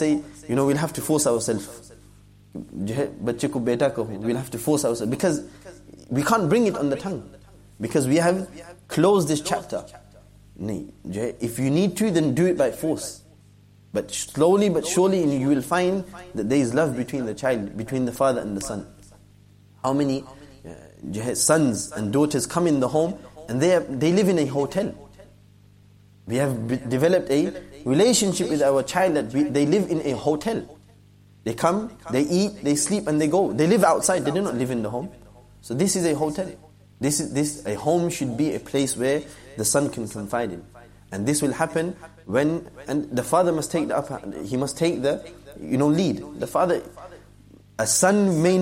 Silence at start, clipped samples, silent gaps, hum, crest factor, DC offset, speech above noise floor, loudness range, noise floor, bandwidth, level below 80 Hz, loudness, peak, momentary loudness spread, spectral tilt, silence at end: 0 s; under 0.1%; none; 50 Hz at -50 dBFS; 18 dB; under 0.1%; 30 dB; 4 LU; -52 dBFS; 16 kHz; -54 dBFS; -23 LUFS; -4 dBFS; 13 LU; -5 dB/octave; 0 s